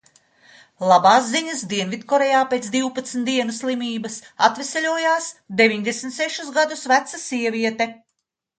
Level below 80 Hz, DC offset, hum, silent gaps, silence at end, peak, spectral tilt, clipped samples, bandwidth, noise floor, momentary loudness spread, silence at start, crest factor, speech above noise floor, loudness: -72 dBFS; under 0.1%; none; none; 0.65 s; 0 dBFS; -3 dB/octave; under 0.1%; 9.6 kHz; -77 dBFS; 9 LU; 0.8 s; 20 dB; 57 dB; -20 LUFS